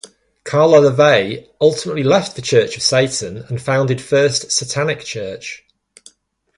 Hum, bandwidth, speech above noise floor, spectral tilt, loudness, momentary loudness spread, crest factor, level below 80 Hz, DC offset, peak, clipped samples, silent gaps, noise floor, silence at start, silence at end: none; 11.5 kHz; 41 dB; -4 dB/octave; -15 LUFS; 15 LU; 16 dB; -54 dBFS; under 0.1%; 0 dBFS; under 0.1%; none; -56 dBFS; 0.45 s; 1 s